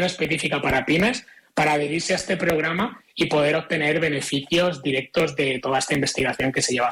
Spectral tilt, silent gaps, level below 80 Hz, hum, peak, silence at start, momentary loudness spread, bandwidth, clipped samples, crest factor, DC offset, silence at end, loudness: -4 dB/octave; none; -50 dBFS; none; -12 dBFS; 0 s; 4 LU; 16.5 kHz; under 0.1%; 12 dB; under 0.1%; 0 s; -22 LUFS